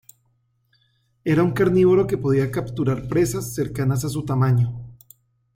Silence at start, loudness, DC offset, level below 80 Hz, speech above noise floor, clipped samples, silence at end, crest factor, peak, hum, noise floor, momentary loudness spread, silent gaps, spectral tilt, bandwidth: 1.25 s; -21 LUFS; under 0.1%; -48 dBFS; 47 dB; under 0.1%; 0.6 s; 16 dB; -6 dBFS; none; -66 dBFS; 9 LU; none; -7.5 dB/octave; 16.5 kHz